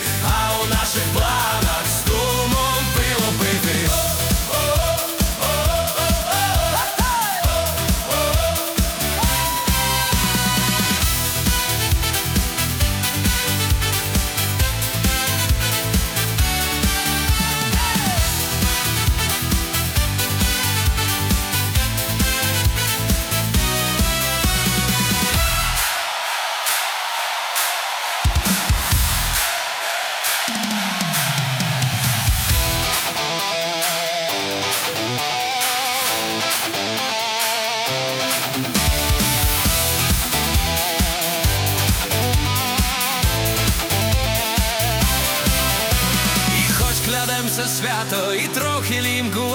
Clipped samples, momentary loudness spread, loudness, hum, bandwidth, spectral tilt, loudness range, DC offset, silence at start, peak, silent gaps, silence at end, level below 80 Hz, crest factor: under 0.1%; 3 LU; -19 LUFS; none; over 20 kHz; -3 dB/octave; 2 LU; under 0.1%; 0 s; -4 dBFS; none; 0 s; -28 dBFS; 16 dB